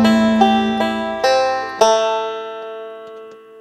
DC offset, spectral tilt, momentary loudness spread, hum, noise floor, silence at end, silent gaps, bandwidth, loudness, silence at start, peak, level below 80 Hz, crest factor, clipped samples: under 0.1%; -4.5 dB/octave; 19 LU; none; -37 dBFS; 0 s; none; 13.5 kHz; -16 LUFS; 0 s; 0 dBFS; -50 dBFS; 16 dB; under 0.1%